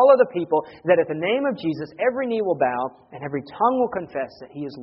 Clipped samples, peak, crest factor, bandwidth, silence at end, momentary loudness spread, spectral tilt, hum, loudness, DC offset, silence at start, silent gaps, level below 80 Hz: under 0.1%; -2 dBFS; 20 dB; 5.8 kHz; 0 s; 11 LU; -4.5 dB/octave; none; -23 LUFS; under 0.1%; 0 s; none; -64 dBFS